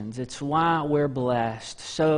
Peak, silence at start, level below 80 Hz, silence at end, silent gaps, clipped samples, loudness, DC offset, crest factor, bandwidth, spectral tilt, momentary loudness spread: -12 dBFS; 0 s; -56 dBFS; 0 s; none; under 0.1%; -25 LUFS; under 0.1%; 14 dB; 10.5 kHz; -6 dB/octave; 11 LU